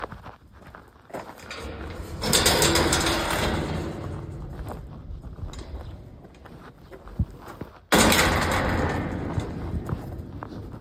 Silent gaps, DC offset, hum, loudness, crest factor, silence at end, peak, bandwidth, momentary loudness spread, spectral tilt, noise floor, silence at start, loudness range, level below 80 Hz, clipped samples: none; under 0.1%; none; -24 LUFS; 22 dB; 0 s; -4 dBFS; 16.5 kHz; 23 LU; -3.5 dB/octave; -47 dBFS; 0 s; 14 LU; -38 dBFS; under 0.1%